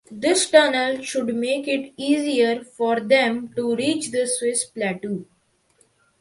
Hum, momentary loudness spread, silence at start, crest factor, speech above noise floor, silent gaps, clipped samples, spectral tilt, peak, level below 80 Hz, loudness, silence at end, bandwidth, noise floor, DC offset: none; 10 LU; 0.1 s; 22 dB; 41 dB; none; under 0.1%; -3 dB/octave; 0 dBFS; -68 dBFS; -21 LUFS; 1 s; 11.5 kHz; -62 dBFS; under 0.1%